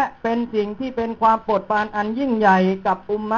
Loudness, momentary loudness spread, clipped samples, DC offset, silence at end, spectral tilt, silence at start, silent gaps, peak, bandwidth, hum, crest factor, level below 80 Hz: -20 LUFS; 8 LU; under 0.1%; under 0.1%; 0 s; -7.5 dB/octave; 0 s; none; -2 dBFS; 7.4 kHz; none; 16 dB; -52 dBFS